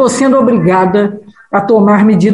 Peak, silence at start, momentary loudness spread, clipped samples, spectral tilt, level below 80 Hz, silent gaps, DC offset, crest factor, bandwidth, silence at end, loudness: 0 dBFS; 0 s; 8 LU; under 0.1%; -6.5 dB/octave; -46 dBFS; none; under 0.1%; 8 dB; 11.5 kHz; 0 s; -9 LUFS